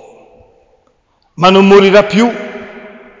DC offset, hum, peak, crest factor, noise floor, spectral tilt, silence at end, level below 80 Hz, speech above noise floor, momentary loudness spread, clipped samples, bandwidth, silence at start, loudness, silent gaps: under 0.1%; none; 0 dBFS; 12 dB; -56 dBFS; -6 dB/octave; 0.35 s; -46 dBFS; 49 dB; 22 LU; under 0.1%; 7.6 kHz; 1.4 s; -8 LUFS; none